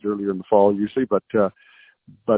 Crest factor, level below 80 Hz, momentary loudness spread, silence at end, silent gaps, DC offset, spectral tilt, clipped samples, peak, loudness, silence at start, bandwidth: 20 dB; -60 dBFS; 8 LU; 0 s; none; under 0.1%; -11.5 dB/octave; under 0.1%; -2 dBFS; -21 LUFS; 0.05 s; 4 kHz